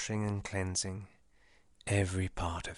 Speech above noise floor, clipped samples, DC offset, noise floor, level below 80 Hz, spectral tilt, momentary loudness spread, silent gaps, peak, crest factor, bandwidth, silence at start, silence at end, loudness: 33 dB; under 0.1%; under 0.1%; -68 dBFS; -52 dBFS; -4.5 dB/octave; 14 LU; none; -16 dBFS; 20 dB; 11.5 kHz; 0 s; 0 s; -35 LUFS